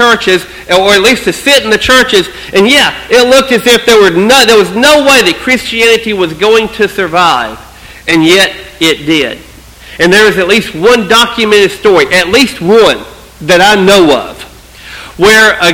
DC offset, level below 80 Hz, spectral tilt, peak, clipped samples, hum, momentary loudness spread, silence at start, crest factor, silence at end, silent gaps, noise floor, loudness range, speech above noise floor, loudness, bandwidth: under 0.1%; -36 dBFS; -3 dB/octave; 0 dBFS; 4%; none; 8 LU; 0 s; 8 dB; 0 s; none; -31 dBFS; 4 LU; 24 dB; -6 LUFS; over 20 kHz